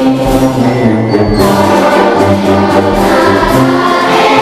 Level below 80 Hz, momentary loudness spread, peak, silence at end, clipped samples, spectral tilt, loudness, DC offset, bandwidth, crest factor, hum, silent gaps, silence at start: -26 dBFS; 2 LU; 0 dBFS; 0 s; 0.8%; -6 dB/octave; -8 LUFS; 0.5%; 15.5 kHz; 8 dB; none; none; 0 s